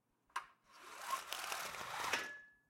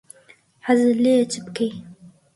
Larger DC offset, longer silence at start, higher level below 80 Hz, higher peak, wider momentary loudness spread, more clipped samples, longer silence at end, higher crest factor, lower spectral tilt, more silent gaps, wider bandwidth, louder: neither; second, 0.35 s vs 0.65 s; second, -80 dBFS vs -66 dBFS; second, -20 dBFS vs -6 dBFS; about the same, 15 LU vs 14 LU; neither; second, 0.15 s vs 0.3 s; first, 26 dB vs 16 dB; second, 0 dB/octave vs -5 dB/octave; neither; first, 16.5 kHz vs 11.5 kHz; second, -43 LUFS vs -20 LUFS